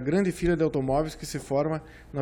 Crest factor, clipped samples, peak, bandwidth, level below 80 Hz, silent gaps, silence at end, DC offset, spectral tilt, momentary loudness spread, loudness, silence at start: 14 dB; under 0.1%; -12 dBFS; 18 kHz; -44 dBFS; none; 0 s; under 0.1%; -6.5 dB/octave; 10 LU; -27 LUFS; 0 s